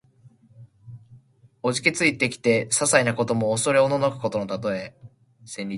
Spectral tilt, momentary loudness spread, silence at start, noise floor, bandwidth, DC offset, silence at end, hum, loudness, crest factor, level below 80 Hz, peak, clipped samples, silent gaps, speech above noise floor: -3.5 dB/octave; 11 LU; 0.25 s; -55 dBFS; 11.5 kHz; under 0.1%; 0 s; none; -22 LUFS; 24 dB; -62 dBFS; -2 dBFS; under 0.1%; none; 32 dB